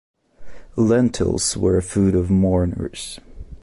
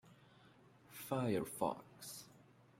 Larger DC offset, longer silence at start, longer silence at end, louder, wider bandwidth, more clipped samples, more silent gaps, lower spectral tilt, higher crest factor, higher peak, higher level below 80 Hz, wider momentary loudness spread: neither; first, 0.4 s vs 0.05 s; second, 0.05 s vs 0.4 s; first, -19 LUFS vs -43 LUFS; second, 11.5 kHz vs 16 kHz; neither; neither; about the same, -6 dB/octave vs -5.5 dB/octave; second, 14 dB vs 22 dB; first, -6 dBFS vs -22 dBFS; first, -34 dBFS vs -78 dBFS; second, 14 LU vs 17 LU